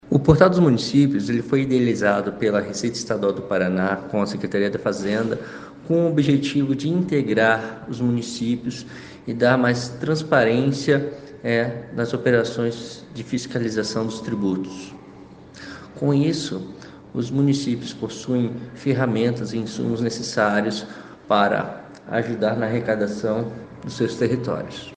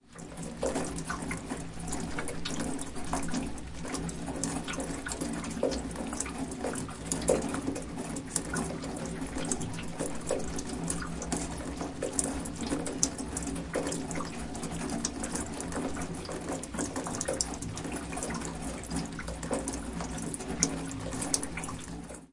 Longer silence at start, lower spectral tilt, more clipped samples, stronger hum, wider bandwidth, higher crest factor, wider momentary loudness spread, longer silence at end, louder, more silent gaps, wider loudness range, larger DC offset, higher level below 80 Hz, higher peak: about the same, 0.05 s vs 0.05 s; first, -6 dB/octave vs -4 dB/octave; neither; neither; second, 9.6 kHz vs 11.5 kHz; second, 22 dB vs 32 dB; first, 14 LU vs 7 LU; about the same, 0 s vs 0 s; first, -22 LUFS vs -35 LUFS; neither; about the same, 4 LU vs 2 LU; neither; second, -52 dBFS vs -46 dBFS; first, 0 dBFS vs -4 dBFS